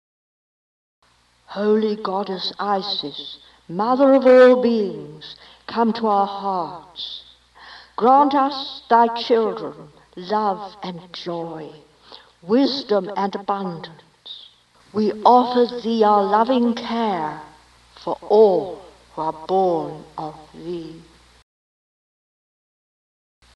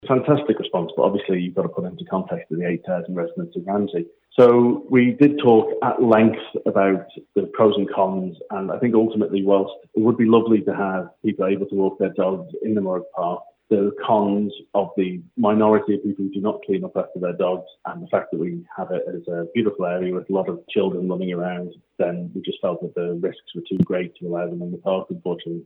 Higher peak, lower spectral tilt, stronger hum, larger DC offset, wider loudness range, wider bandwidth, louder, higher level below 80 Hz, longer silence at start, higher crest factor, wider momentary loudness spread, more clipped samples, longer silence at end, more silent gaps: about the same, 0 dBFS vs -2 dBFS; second, -6.5 dB/octave vs -10 dB/octave; neither; neither; about the same, 9 LU vs 8 LU; first, 8.8 kHz vs 4.2 kHz; about the same, -19 LUFS vs -21 LUFS; first, -62 dBFS vs -68 dBFS; first, 1.5 s vs 0.05 s; about the same, 20 dB vs 18 dB; first, 22 LU vs 12 LU; neither; first, 2.55 s vs 0.05 s; neither